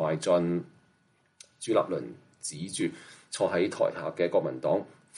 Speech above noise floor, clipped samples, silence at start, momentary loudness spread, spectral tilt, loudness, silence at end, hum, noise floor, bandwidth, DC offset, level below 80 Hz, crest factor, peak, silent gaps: 39 dB; under 0.1%; 0 s; 14 LU; -5 dB/octave; -30 LUFS; 0 s; none; -68 dBFS; 11.5 kHz; under 0.1%; -74 dBFS; 18 dB; -12 dBFS; none